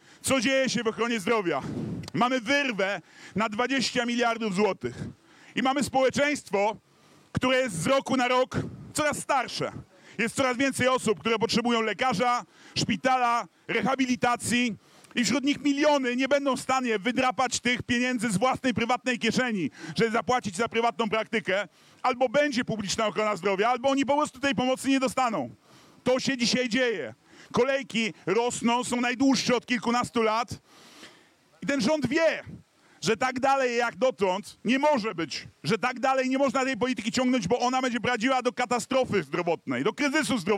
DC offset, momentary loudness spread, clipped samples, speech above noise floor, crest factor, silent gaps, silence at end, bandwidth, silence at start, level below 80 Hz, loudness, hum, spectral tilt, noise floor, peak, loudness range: under 0.1%; 7 LU; under 0.1%; 33 dB; 16 dB; none; 0 s; 15.5 kHz; 0.25 s; -62 dBFS; -26 LUFS; none; -4 dB/octave; -59 dBFS; -12 dBFS; 2 LU